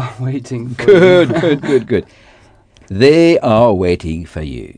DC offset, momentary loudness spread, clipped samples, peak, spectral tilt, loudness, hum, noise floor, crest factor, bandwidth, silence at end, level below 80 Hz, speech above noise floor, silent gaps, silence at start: under 0.1%; 16 LU; 0.4%; 0 dBFS; -7 dB/octave; -12 LUFS; none; -46 dBFS; 12 dB; 10 kHz; 0.1 s; -38 dBFS; 34 dB; none; 0 s